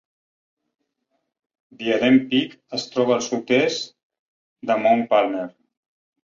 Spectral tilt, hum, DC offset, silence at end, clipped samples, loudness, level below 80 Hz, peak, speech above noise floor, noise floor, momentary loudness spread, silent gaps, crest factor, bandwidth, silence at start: -4.5 dB/octave; none; under 0.1%; 0.8 s; under 0.1%; -21 LUFS; -68 dBFS; -4 dBFS; 55 dB; -75 dBFS; 13 LU; 4.03-4.10 s, 4.19-4.56 s; 18 dB; 7.6 kHz; 1.8 s